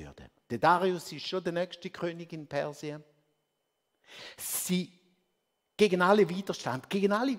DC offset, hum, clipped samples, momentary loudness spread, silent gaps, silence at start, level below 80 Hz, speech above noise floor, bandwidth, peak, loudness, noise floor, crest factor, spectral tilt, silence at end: under 0.1%; none; under 0.1%; 19 LU; none; 0 s; -68 dBFS; 51 dB; 16 kHz; -8 dBFS; -30 LUFS; -81 dBFS; 22 dB; -4.5 dB/octave; 0 s